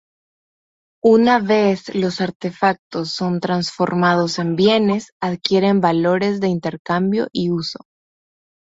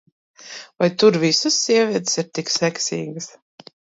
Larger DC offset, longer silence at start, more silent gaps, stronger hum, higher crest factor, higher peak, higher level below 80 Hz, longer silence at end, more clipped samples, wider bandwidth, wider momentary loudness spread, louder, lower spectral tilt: neither; first, 1.05 s vs 0.4 s; first, 2.35-2.40 s, 2.79-2.91 s, 5.12-5.20 s, 6.79-6.85 s vs none; neither; about the same, 18 dB vs 18 dB; about the same, 0 dBFS vs -2 dBFS; first, -58 dBFS vs -70 dBFS; first, 0.9 s vs 0.7 s; neither; about the same, 8 kHz vs 8 kHz; second, 9 LU vs 20 LU; about the same, -18 LUFS vs -19 LUFS; first, -6 dB/octave vs -3.5 dB/octave